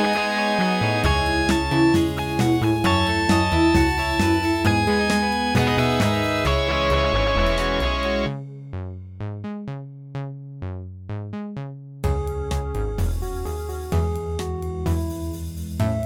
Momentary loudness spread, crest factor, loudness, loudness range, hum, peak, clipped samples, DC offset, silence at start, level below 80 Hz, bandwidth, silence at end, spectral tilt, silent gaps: 15 LU; 16 dB; -22 LUFS; 11 LU; none; -6 dBFS; under 0.1%; under 0.1%; 0 s; -30 dBFS; 18.5 kHz; 0 s; -5.5 dB/octave; none